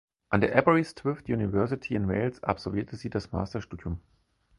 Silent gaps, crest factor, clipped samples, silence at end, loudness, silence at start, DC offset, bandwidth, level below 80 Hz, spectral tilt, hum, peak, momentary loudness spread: none; 24 dB; under 0.1%; 0.6 s; -29 LUFS; 0.3 s; under 0.1%; 11.5 kHz; -48 dBFS; -8 dB/octave; none; -4 dBFS; 14 LU